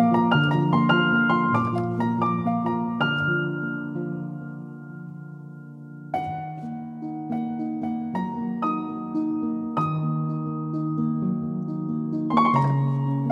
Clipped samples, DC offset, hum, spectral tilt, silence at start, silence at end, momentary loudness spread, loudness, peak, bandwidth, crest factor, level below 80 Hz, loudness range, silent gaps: under 0.1%; under 0.1%; none; -8.5 dB/octave; 0 s; 0 s; 17 LU; -25 LUFS; -6 dBFS; 6 kHz; 18 dB; -66 dBFS; 11 LU; none